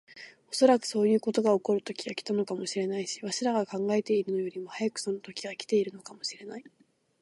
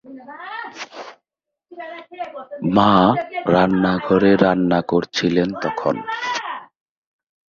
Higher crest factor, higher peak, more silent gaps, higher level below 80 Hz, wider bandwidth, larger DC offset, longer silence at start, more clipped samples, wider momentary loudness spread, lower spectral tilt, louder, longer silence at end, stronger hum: about the same, 20 dB vs 20 dB; second, -8 dBFS vs 0 dBFS; neither; second, -82 dBFS vs -52 dBFS; first, 11.5 kHz vs 7.2 kHz; neither; about the same, 0.1 s vs 0.05 s; neither; second, 12 LU vs 20 LU; second, -4.5 dB/octave vs -6.5 dB/octave; second, -29 LUFS vs -18 LUFS; second, 0.55 s vs 0.95 s; neither